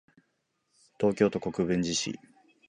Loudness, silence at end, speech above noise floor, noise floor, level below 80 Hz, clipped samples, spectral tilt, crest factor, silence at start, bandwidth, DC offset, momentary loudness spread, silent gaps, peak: -29 LUFS; 0.5 s; 49 dB; -77 dBFS; -60 dBFS; under 0.1%; -4.5 dB/octave; 22 dB; 1 s; 10.5 kHz; under 0.1%; 9 LU; none; -10 dBFS